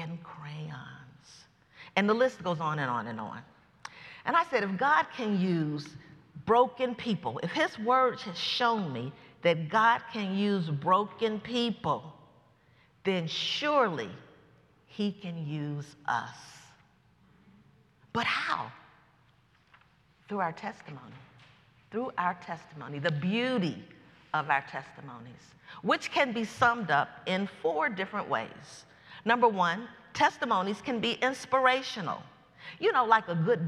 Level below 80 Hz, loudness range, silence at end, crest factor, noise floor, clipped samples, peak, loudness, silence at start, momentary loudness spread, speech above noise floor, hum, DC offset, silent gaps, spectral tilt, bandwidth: -72 dBFS; 9 LU; 0 s; 24 dB; -65 dBFS; under 0.1%; -8 dBFS; -30 LUFS; 0 s; 18 LU; 35 dB; none; under 0.1%; none; -5.5 dB/octave; 12 kHz